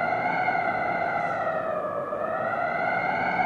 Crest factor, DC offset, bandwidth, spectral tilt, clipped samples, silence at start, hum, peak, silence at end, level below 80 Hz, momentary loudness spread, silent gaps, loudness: 14 dB; under 0.1%; 8.4 kHz; -6.5 dB/octave; under 0.1%; 0 s; none; -12 dBFS; 0 s; -60 dBFS; 4 LU; none; -26 LUFS